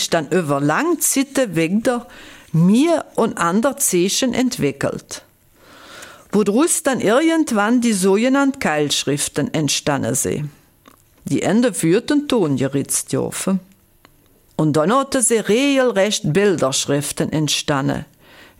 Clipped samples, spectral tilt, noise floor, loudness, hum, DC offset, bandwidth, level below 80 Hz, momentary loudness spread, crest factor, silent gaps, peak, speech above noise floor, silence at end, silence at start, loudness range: under 0.1%; -4 dB/octave; -53 dBFS; -18 LUFS; none; under 0.1%; 17 kHz; -54 dBFS; 8 LU; 14 dB; none; -4 dBFS; 36 dB; 0.55 s; 0 s; 3 LU